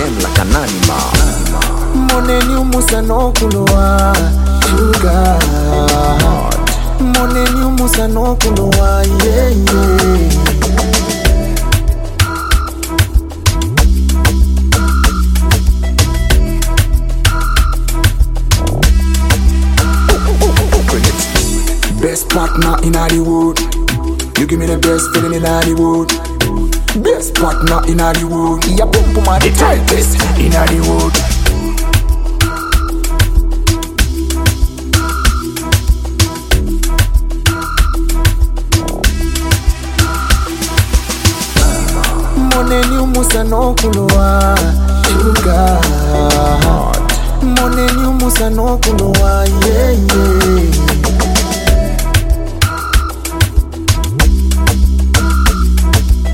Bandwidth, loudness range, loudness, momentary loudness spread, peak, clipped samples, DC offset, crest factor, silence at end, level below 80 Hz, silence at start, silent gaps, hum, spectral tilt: 17 kHz; 3 LU; -12 LUFS; 4 LU; 0 dBFS; under 0.1%; under 0.1%; 10 dB; 0 s; -12 dBFS; 0 s; none; none; -4.5 dB/octave